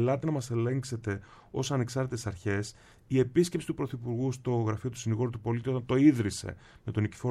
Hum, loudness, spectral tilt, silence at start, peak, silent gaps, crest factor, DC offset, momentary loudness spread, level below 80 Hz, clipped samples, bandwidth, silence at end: none; -31 LUFS; -6.5 dB/octave; 0 s; -10 dBFS; none; 20 dB; under 0.1%; 11 LU; -58 dBFS; under 0.1%; 13.5 kHz; 0 s